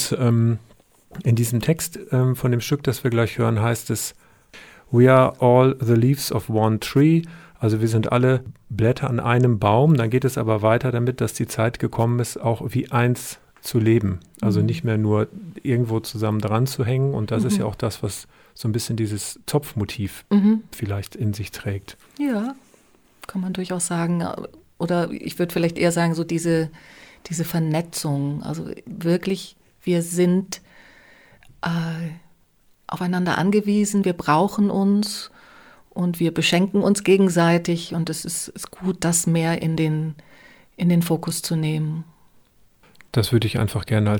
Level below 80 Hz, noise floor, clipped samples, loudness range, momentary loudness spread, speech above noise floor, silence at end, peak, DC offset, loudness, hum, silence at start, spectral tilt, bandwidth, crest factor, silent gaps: -52 dBFS; -58 dBFS; under 0.1%; 7 LU; 12 LU; 38 dB; 0 s; -4 dBFS; under 0.1%; -21 LUFS; none; 0 s; -6 dB/octave; 19.5 kHz; 18 dB; none